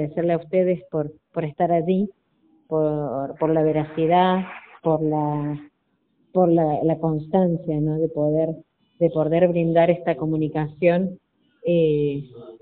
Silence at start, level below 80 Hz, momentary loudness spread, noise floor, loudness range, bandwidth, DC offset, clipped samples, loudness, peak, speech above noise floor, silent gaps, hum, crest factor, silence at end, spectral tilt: 0 s; -56 dBFS; 11 LU; -69 dBFS; 3 LU; 4.3 kHz; under 0.1%; under 0.1%; -22 LUFS; -4 dBFS; 48 dB; none; none; 16 dB; 0.05 s; -7.5 dB/octave